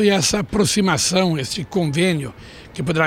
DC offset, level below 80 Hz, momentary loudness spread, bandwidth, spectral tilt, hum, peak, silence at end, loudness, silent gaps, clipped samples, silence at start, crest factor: under 0.1%; -44 dBFS; 10 LU; 16.5 kHz; -4 dB/octave; none; -4 dBFS; 0 s; -19 LUFS; none; under 0.1%; 0 s; 16 dB